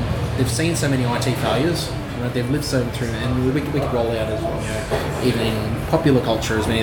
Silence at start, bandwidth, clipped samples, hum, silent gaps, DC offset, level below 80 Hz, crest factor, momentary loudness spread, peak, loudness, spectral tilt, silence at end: 0 s; 18 kHz; under 0.1%; none; none; under 0.1%; -34 dBFS; 18 dB; 5 LU; -2 dBFS; -21 LUFS; -5.5 dB/octave; 0 s